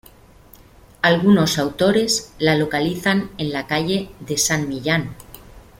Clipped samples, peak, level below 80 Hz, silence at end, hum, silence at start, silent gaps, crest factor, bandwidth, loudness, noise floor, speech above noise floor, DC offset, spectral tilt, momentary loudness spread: under 0.1%; -2 dBFS; -48 dBFS; 0.2 s; none; 1.05 s; none; 20 dB; 16.5 kHz; -19 LUFS; -47 dBFS; 28 dB; under 0.1%; -4 dB/octave; 10 LU